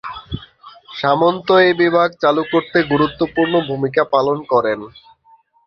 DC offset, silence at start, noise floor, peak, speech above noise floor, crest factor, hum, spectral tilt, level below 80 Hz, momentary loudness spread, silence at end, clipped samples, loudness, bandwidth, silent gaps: under 0.1%; 0.05 s; -53 dBFS; -2 dBFS; 37 dB; 16 dB; none; -7.5 dB/octave; -48 dBFS; 15 LU; 0.8 s; under 0.1%; -16 LUFS; 6.4 kHz; none